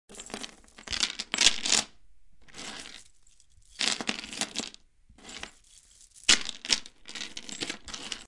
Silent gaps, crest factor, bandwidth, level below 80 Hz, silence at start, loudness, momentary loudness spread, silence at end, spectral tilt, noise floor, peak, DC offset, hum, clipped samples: none; 32 dB; 11.5 kHz; -58 dBFS; 0.1 s; -28 LUFS; 21 LU; 0 s; 0.5 dB/octave; -62 dBFS; -2 dBFS; under 0.1%; none; under 0.1%